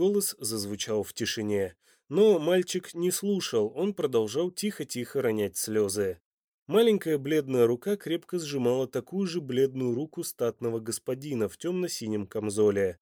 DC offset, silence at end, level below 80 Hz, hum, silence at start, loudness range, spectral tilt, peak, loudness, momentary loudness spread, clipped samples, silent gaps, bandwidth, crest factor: under 0.1%; 0.1 s; -70 dBFS; none; 0 s; 3 LU; -4.5 dB/octave; -12 dBFS; -28 LUFS; 8 LU; under 0.1%; 6.26-6.38 s, 6.44-6.66 s; over 20 kHz; 16 dB